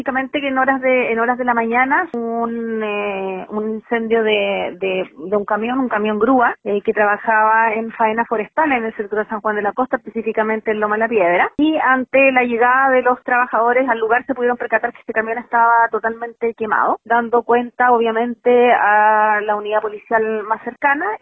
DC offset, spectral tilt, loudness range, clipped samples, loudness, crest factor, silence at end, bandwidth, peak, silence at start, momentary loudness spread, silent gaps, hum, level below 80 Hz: under 0.1%; -8 dB/octave; 4 LU; under 0.1%; -17 LUFS; 16 dB; 0.05 s; 3.9 kHz; -2 dBFS; 0 s; 9 LU; none; none; -58 dBFS